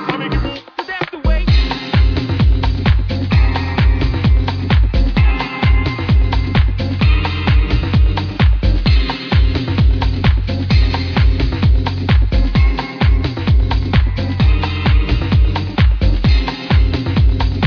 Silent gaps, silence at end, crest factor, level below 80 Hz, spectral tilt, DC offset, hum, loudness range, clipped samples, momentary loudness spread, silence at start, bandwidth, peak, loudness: none; 0 s; 12 dB; -16 dBFS; -8 dB/octave; under 0.1%; none; 1 LU; under 0.1%; 3 LU; 0 s; 5.4 kHz; -2 dBFS; -15 LUFS